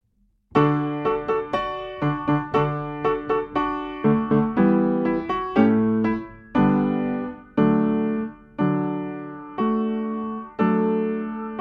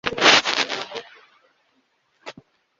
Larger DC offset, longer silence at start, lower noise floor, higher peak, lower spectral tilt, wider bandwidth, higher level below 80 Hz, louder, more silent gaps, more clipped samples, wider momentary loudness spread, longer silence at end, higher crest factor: neither; first, 0.55 s vs 0.05 s; about the same, -65 dBFS vs -67 dBFS; second, -4 dBFS vs 0 dBFS; first, -9.5 dB/octave vs -1 dB/octave; second, 5.8 kHz vs 8 kHz; first, -50 dBFS vs -60 dBFS; second, -23 LUFS vs -17 LUFS; neither; neither; second, 10 LU vs 27 LU; second, 0 s vs 0.5 s; second, 18 dB vs 24 dB